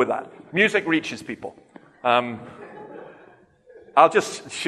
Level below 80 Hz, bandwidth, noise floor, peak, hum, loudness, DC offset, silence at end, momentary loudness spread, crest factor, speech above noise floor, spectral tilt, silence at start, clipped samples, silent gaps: -70 dBFS; 13 kHz; -52 dBFS; -2 dBFS; none; -21 LUFS; under 0.1%; 0 s; 23 LU; 22 dB; 31 dB; -4 dB/octave; 0 s; under 0.1%; none